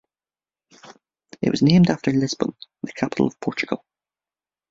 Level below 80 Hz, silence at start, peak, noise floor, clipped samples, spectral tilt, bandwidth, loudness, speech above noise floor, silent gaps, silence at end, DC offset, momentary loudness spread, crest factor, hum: -58 dBFS; 0.85 s; -2 dBFS; under -90 dBFS; under 0.1%; -6.5 dB/octave; 7.8 kHz; -21 LUFS; over 70 dB; none; 0.95 s; under 0.1%; 13 LU; 20 dB; none